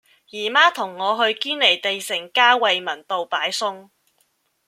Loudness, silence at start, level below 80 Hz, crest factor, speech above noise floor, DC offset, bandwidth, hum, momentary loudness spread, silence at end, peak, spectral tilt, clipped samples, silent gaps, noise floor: -19 LUFS; 0.35 s; -78 dBFS; 20 dB; 46 dB; under 0.1%; 16 kHz; none; 10 LU; 0.85 s; 0 dBFS; -1 dB/octave; under 0.1%; none; -66 dBFS